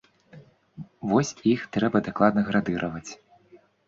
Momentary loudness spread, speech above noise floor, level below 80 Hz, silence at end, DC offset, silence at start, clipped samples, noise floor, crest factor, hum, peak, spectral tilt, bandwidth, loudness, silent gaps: 18 LU; 32 dB; -58 dBFS; 0.3 s; under 0.1%; 0.35 s; under 0.1%; -56 dBFS; 20 dB; none; -6 dBFS; -6 dB/octave; 7.6 kHz; -25 LUFS; none